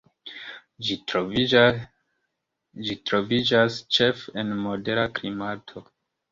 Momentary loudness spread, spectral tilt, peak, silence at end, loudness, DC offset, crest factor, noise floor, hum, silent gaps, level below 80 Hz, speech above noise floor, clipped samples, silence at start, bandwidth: 19 LU; -5 dB/octave; -2 dBFS; 0.5 s; -24 LUFS; under 0.1%; 22 dB; -79 dBFS; none; none; -58 dBFS; 56 dB; under 0.1%; 0.25 s; 7.6 kHz